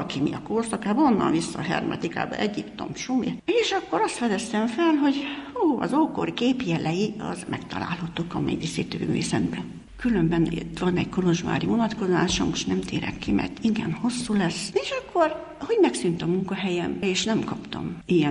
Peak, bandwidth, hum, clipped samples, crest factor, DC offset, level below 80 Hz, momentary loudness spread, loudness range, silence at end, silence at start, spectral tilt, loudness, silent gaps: -8 dBFS; 11.5 kHz; none; under 0.1%; 16 dB; under 0.1%; -50 dBFS; 8 LU; 3 LU; 0 s; 0 s; -5.5 dB/octave; -25 LUFS; none